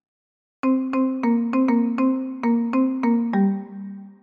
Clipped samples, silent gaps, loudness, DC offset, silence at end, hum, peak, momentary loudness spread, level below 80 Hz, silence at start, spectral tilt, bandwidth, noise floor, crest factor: under 0.1%; none; -22 LUFS; under 0.1%; 0.1 s; none; -10 dBFS; 8 LU; -70 dBFS; 0.65 s; -9.5 dB/octave; 5 kHz; under -90 dBFS; 12 dB